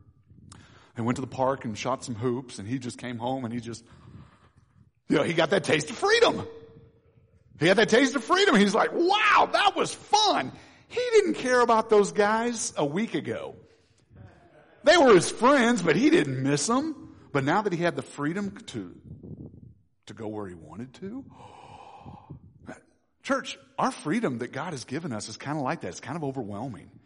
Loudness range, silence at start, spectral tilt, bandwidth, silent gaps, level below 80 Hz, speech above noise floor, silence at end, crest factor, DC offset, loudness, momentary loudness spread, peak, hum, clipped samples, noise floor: 15 LU; 0.95 s; -4.5 dB/octave; 10.5 kHz; none; -62 dBFS; 35 dB; 0.25 s; 16 dB; under 0.1%; -25 LUFS; 20 LU; -10 dBFS; none; under 0.1%; -60 dBFS